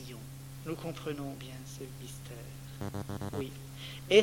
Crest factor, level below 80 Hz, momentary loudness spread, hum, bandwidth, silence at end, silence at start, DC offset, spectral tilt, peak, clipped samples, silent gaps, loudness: 26 dB; -58 dBFS; 7 LU; none; 17.5 kHz; 0 s; 0 s; under 0.1%; -5 dB/octave; -10 dBFS; under 0.1%; none; -39 LUFS